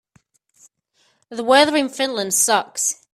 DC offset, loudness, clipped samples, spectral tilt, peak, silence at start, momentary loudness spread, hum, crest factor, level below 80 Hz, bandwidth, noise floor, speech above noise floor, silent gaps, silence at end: under 0.1%; -17 LUFS; under 0.1%; -1 dB/octave; 0 dBFS; 1.3 s; 10 LU; none; 20 dB; -68 dBFS; 16 kHz; -64 dBFS; 45 dB; none; 0.2 s